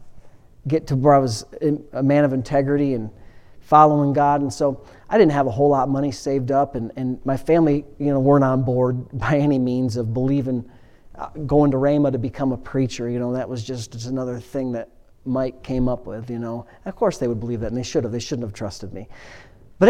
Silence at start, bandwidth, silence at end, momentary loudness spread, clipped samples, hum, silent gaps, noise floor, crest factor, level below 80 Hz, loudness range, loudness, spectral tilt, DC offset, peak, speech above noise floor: 0 s; 11 kHz; 0 s; 15 LU; under 0.1%; none; none; -42 dBFS; 20 dB; -44 dBFS; 8 LU; -21 LUFS; -7.5 dB/octave; under 0.1%; 0 dBFS; 22 dB